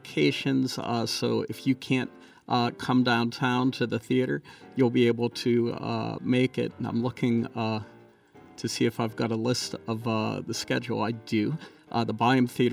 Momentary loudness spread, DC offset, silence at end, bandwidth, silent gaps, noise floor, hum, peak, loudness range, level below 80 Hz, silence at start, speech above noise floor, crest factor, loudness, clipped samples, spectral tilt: 8 LU; under 0.1%; 0 s; 15 kHz; none; -53 dBFS; none; -10 dBFS; 4 LU; -68 dBFS; 0.05 s; 27 dB; 16 dB; -27 LUFS; under 0.1%; -5.5 dB/octave